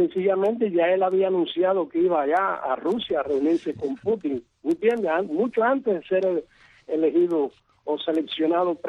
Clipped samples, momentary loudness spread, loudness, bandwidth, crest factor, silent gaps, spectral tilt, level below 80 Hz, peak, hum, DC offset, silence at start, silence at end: under 0.1%; 7 LU; -24 LUFS; 6.6 kHz; 14 dB; none; -7 dB/octave; -66 dBFS; -10 dBFS; none; under 0.1%; 0 s; 0 s